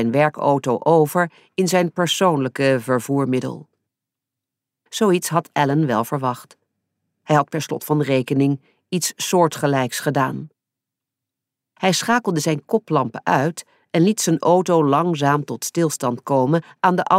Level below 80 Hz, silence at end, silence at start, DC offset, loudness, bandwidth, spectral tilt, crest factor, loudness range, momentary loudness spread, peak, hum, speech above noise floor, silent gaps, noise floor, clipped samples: -70 dBFS; 0 s; 0 s; under 0.1%; -19 LUFS; 16 kHz; -5 dB/octave; 16 dB; 4 LU; 7 LU; -2 dBFS; none; 66 dB; none; -85 dBFS; under 0.1%